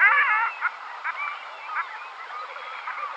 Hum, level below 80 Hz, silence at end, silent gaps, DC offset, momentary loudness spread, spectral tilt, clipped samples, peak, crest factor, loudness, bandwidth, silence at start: none; under -90 dBFS; 0 s; none; under 0.1%; 15 LU; 2 dB/octave; under 0.1%; -6 dBFS; 20 dB; -26 LUFS; 8.6 kHz; 0 s